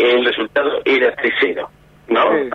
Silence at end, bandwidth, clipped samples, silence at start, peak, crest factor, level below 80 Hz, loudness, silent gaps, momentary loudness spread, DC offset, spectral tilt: 0 s; 6.6 kHz; under 0.1%; 0 s; -4 dBFS; 12 dB; -56 dBFS; -16 LUFS; none; 5 LU; under 0.1%; -5 dB/octave